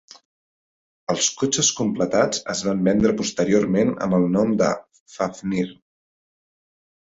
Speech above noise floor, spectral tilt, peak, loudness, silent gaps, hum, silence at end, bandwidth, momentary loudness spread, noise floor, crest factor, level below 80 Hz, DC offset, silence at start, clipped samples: over 69 dB; -4 dB/octave; -6 dBFS; -21 LUFS; 5.00-5.06 s; none; 1.4 s; 8 kHz; 9 LU; under -90 dBFS; 18 dB; -54 dBFS; under 0.1%; 1.1 s; under 0.1%